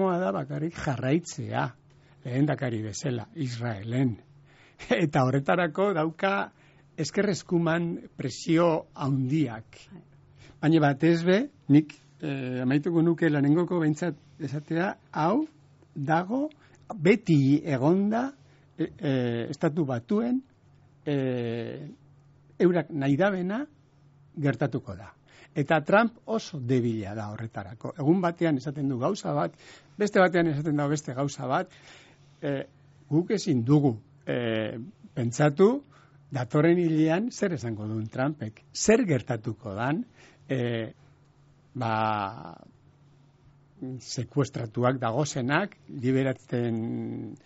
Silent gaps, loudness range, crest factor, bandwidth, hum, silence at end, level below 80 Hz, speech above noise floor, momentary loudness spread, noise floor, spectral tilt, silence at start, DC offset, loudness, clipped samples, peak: none; 5 LU; 20 dB; 8 kHz; none; 0.1 s; -64 dBFS; 32 dB; 14 LU; -59 dBFS; -6.5 dB/octave; 0 s; under 0.1%; -27 LUFS; under 0.1%; -8 dBFS